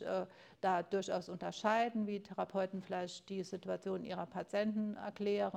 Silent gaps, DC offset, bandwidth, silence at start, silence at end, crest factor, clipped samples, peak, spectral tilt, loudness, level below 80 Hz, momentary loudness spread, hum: none; under 0.1%; 9.8 kHz; 0 s; 0 s; 18 dB; under 0.1%; -20 dBFS; -5.5 dB/octave; -39 LUFS; -80 dBFS; 8 LU; none